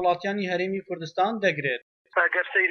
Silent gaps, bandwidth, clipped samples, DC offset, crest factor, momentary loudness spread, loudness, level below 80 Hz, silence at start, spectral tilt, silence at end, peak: 1.82-2.05 s; 6.8 kHz; under 0.1%; under 0.1%; 16 dB; 9 LU; -26 LUFS; -74 dBFS; 0 s; -5.5 dB/octave; 0 s; -10 dBFS